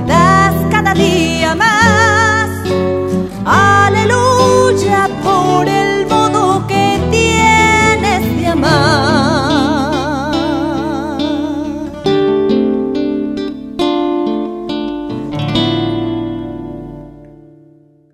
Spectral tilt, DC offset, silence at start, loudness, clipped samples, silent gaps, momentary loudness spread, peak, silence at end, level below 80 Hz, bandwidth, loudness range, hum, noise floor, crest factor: -5 dB/octave; under 0.1%; 0 s; -12 LUFS; under 0.1%; none; 11 LU; 0 dBFS; 0.8 s; -34 dBFS; 16 kHz; 7 LU; none; -46 dBFS; 12 dB